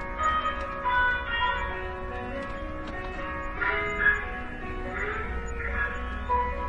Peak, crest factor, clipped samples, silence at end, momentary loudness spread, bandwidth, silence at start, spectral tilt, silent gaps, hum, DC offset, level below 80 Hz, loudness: -10 dBFS; 18 dB; under 0.1%; 0 s; 11 LU; 9 kHz; 0 s; -5 dB/octave; none; none; under 0.1%; -38 dBFS; -29 LUFS